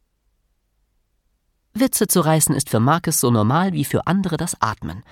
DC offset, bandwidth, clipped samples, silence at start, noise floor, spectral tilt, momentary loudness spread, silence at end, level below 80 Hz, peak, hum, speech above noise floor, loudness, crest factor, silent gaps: under 0.1%; 18 kHz; under 0.1%; 1.75 s; -67 dBFS; -5 dB/octave; 7 LU; 0.1 s; -50 dBFS; -2 dBFS; none; 49 dB; -18 LUFS; 18 dB; none